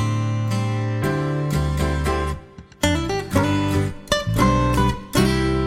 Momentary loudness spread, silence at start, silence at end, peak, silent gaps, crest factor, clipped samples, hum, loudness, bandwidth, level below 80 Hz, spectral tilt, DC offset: 5 LU; 0 s; 0 s; -2 dBFS; none; 18 dB; under 0.1%; none; -21 LUFS; 16.5 kHz; -30 dBFS; -6 dB/octave; under 0.1%